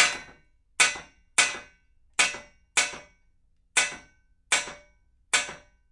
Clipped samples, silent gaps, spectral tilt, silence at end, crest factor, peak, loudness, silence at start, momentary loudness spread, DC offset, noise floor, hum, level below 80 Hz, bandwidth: under 0.1%; none; 1.5 dB/octave; 0.35 s; 26 dB; -4 dBFS; -25 LUFS; 0 s; 17 LU; under 0.1%; -64 dBFS; none; -62 dBFS; 11.5 kHz